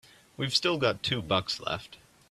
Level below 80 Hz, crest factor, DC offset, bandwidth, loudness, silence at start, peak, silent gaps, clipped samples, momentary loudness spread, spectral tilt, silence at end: -60 dBFS; 22 dB; under 0.1%; 14 kHz; -29 LUFS; 0.4 s; -10 dBFS; none; under 0.1%; 10 LU; -4 dB/octave; 0.35 s